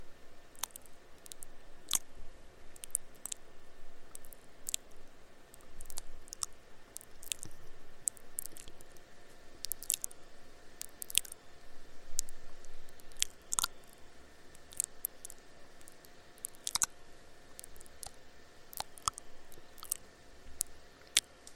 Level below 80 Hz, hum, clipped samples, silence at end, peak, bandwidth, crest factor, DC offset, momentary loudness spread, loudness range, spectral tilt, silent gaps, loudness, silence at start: -52 dBFS; none; under 0.1%; 0 s; -2 dBFS; 17 kHz; 40 dB; under 0.1%; 25 LU; 5 LU; 0.5 dB/octave; none; -39 LUFS; 0 s